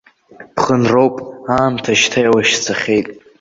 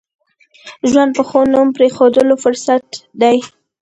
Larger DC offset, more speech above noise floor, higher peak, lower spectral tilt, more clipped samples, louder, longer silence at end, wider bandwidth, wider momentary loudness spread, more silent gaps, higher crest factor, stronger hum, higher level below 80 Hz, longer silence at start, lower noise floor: neither; second, 27 dB vs 32 dB; about the same, 0 dBFS vs 0 dBFS; about the same, -4 dB/octave vs -4 dB/octave; neither; about the same, -14 LUFS vs -13 LUFS; second, 0.2 s vs 0.35 s; second, 8 kHz vs 9.2 kHz; about the same, 9 LU vs 7 LU; neither; about the same, 16 dB vs 14 dB; neither; about the same, -50 dBFS vs -54 dBFS; second, 0.4 s vs 0.65 s; about the same, -41 dBFS vs -44 dBFS